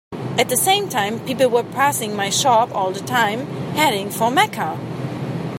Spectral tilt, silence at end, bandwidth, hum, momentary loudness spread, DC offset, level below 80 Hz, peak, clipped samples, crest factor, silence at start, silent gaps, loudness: -3.5 dB/octave; 0 s; 16.5 kHz; none; 10 LU; under 0.1%; -60 dBFS; 0 dBFS; under 0.1%; 18 dB; 0.1 s; none; -19 LUFS